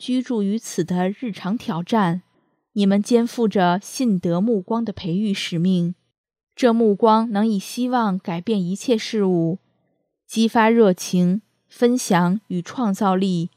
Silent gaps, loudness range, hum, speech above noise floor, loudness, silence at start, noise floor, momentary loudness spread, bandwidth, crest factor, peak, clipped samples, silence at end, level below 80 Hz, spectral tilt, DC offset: 6.18-6.24 s, 6.43-6.47 s; 2 LU; none; 51 dB; -20 LUFS; 0 s; -70 dBFS; 9 LU; 15 kHz; 18 dB; -2 dBFS; under 0.1%; 0.1 s; -66 dBFS; -6 dB/octave; under 0.1%